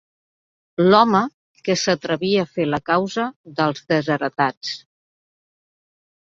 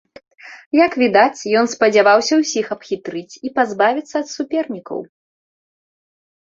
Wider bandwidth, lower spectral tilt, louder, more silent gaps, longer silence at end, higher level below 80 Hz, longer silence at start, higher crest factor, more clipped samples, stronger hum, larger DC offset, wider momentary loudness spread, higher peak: about the same, 7.8 kHz vs 7.8 kHz; first, -5 dB/octave vs -3.5 dB/octave; second, -20 LUFS vs -17 LUFS; first, 1.34-1.55 s, 3.36-3.44 s, 4.57-4.61 s vs 0.66-0.71 s; about the same, 1.55 s vs 1.45 s; about the same, -62 dBFS vs -64 dBFS; first, 0.8 s vs 0.45 s; about the same, 20 dB vs 16 dB; neither; neither; neither; about the same, 15 LU vs 14 LU; about the same, -2 dBFS vs -2 dBFS